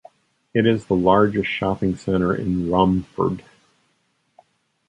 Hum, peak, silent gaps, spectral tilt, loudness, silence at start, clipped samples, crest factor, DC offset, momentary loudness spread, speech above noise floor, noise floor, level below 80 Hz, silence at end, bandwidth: none; -2 dBFS; none; -8 dB/octave; -20 LUFS; 0.55 s; under 0.1%; 20 dB; under 0.1%; 7 LU; 48 dB; -67 dBFS; -44 dBFS; 1.5 s; 9.2 kHz